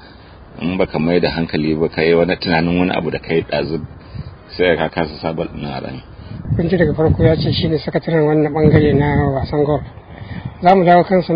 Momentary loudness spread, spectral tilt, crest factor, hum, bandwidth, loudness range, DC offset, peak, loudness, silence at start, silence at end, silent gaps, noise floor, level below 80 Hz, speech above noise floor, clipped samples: 19 LU; -10 dB/octave; 16 dB; none; 5.2 kHz; 6 LU; under 0.1%; 0 dBFS; -16 LUFS; 0 s; 0 s; none; -39 dBFS; -34 dBFS; 24 dB; under 0.1%